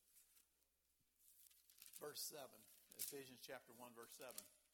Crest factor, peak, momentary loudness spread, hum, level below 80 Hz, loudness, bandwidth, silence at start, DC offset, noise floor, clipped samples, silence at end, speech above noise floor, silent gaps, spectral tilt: 26 dB; -34 dBFS; 17 LU; none; under -90 dBFS; -55 LUFS; 19 kHz; 0 s; under 0.1%; -85 dBFS; under 0.1%; 0.05 s; 28 dB; none; -1 dB/octave